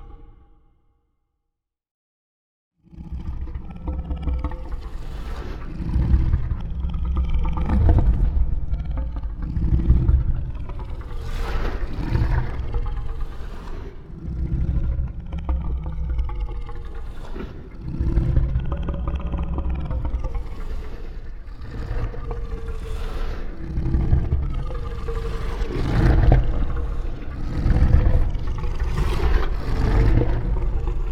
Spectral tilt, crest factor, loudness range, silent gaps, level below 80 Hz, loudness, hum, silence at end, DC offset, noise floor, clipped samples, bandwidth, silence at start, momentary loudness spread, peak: -8.5 dB/octave; 20 dB; 10 LU; 1.91-2.71 s; -24 dBFS; -26 LUFS; none; 0 s; under 0.1%; -80 dBFS; under 0.1%; 6.6 kHz; 0 s; 16 LU; -2 dBFS